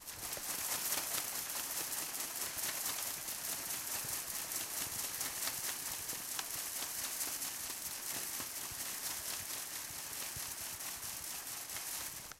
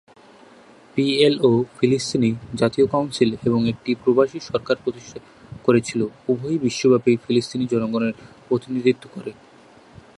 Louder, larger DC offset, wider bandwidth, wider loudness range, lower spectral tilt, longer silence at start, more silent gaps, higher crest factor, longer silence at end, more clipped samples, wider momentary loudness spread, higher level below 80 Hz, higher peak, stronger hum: second, -38 LUFS vs -21 LUFS; neither; first, 16.5 kHz vs 11.5 kHz; about the same, 3 LU vs 3 LU; second, 0.5 dB/octave vs -6 dB/octave; second, 0 s vs 0.95 s; neither; about the same, 22 dB vs 20 dB; second, 0 s vs 0.85 s; neither; second, 4 LU vs 11 LU; second, -70 dBFS vs -56 dBFS; second, -20 dBFS vs -2 dBFS; neither